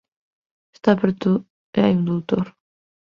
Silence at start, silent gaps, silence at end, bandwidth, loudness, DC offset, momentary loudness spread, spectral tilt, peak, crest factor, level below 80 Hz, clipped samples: 0.85 s; 1.50-1.73 s; 0.6 s; 6.8 kHz; -21 LUFS; under 0.1%; 6 LU; -9 dB/octave; -2 dBFS; 20 dB; -58 dBFS; under 0.1%